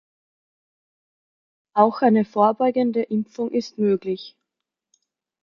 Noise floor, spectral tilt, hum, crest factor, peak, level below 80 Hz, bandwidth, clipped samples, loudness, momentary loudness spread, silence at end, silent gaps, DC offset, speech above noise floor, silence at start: -84 dBFS; -7.5 dB/octave; none; 22 dB; -2 dBFS; -70 dBFS; 7 kHz; under 0.1%; -21 LUFS; 10 LU; 1.15 s; none; under 0.1%; 64 dB; 1.75 s